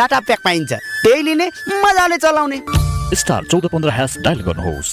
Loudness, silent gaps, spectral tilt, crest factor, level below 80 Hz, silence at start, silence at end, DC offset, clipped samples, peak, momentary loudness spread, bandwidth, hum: -16 LUFS; none; -4.5 dB/octave; 12 dB; -30 dBFS; 0 s; 0 s; under 0.1%; under 0.1%; -4 dBFS; 6 LU; 16 kHz; none